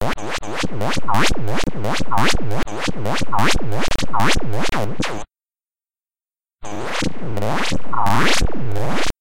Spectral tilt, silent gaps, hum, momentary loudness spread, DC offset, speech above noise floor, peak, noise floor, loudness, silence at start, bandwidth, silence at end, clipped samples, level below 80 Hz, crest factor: -4 dB/octave; none; none; 7 LU; under 0.1%; over 77 dB; -2 dBFS; under -90 dBFS; -21 LUFS; 0 s; 17 kHz; 0 s; under 0.1%; -32 dBFS; 12 dB